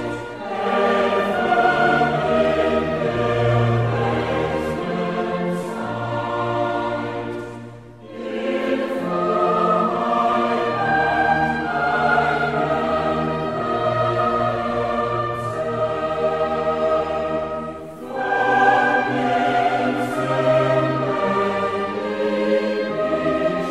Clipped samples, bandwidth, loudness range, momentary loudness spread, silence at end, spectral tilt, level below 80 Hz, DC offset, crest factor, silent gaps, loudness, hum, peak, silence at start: under 0.1%; 13 kHz; 5 LU; 8 LU; 0 s; -6.5 dB/octave; -48 dBFS; 0.2%; 16 dB; none; -20 LUFS; none; -4 dBFS; 0 s